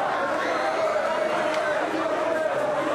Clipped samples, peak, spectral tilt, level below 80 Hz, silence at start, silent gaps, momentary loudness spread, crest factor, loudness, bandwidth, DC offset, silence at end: under 0.1%; -14 dBFS; -4 dB/octave; -66 dBFS; 0 s; none; 1 LU; 10 dB; -25 LUFS; 13.5 kHz; under 0.1%; 0 s